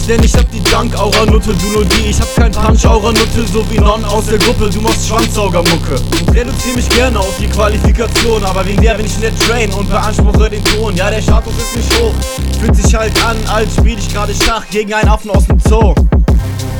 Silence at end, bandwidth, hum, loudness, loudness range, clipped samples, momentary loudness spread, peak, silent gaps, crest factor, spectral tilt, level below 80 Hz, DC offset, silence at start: 0 s; 19.5 kHz; none; -11 LUFS; 2 LU; 0.2%; 5 LU; 0 dBFS; none; 10 dB; -5 dB/octave; -14 dBFS; under 0.1%; 0 s